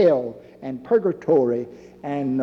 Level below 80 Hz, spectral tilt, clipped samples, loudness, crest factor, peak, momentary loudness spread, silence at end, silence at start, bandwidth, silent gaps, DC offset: -64 dBFS; -9 dB/octave; under 0.1%; -22 LUFS; 14 dB; -6 dBFS; 17 LU; 0 s; 0 s; 6.6 kHz; none; under 0.1%